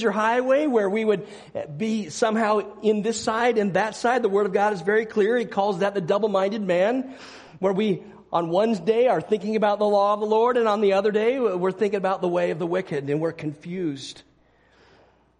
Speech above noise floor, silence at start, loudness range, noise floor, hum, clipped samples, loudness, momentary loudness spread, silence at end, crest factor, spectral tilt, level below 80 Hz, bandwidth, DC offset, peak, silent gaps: 37 dB; 0 s; 4 LU; -59 dBFS; none; under 0.1%; -23 LUFS; 9 LU; 1.2 s; 16 dB; -5.5 dB/octave; -66 dBFS; 10.5 kHz; under 0.1%; -8 dBFS; none